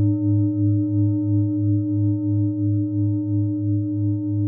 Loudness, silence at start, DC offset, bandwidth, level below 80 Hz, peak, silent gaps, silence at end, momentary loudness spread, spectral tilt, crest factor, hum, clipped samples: -21 LUFS; 0 s; under 0.1%; 1.4 kHz; -66 dBFS; -10 dBFS; none; 0 s; 3 LU; -18 dB/octave; 10 dB; none; under 0.1%